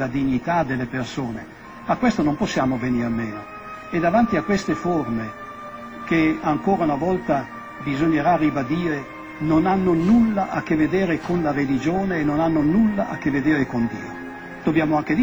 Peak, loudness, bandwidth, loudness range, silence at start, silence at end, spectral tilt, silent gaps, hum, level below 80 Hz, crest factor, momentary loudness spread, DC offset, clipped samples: -6 dBFS; -21 LUFS; over 20 kHz; 3 LU; 0 s; 0 s; -7 dB/octave; none; none; -46 dBFS; 16 dB; 15 LU; 0.1%; under 0.1%